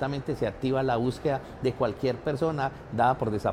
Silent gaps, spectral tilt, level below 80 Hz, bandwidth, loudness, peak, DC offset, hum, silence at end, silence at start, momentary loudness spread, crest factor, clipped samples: none; -7.5 dB/octave; -50 dBFS; 14 kHz; -28 LUFS; -10 dBFS; under 0.1%; none; 0 s; 0 s; 6 LU; 16 dB; under 0.1%